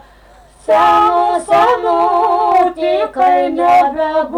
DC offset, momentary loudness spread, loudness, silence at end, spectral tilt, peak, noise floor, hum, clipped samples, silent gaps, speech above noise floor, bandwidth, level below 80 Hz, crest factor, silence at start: under 0.1%; 5 LU; -12 LUFS; 0 s; -4.5 dB/octave; -4 dBFS; -43 dBFS; none; under 0.1%; none; 32 dB; 11.5 kHz; -46 dBFS; 8 dB; 0.7 s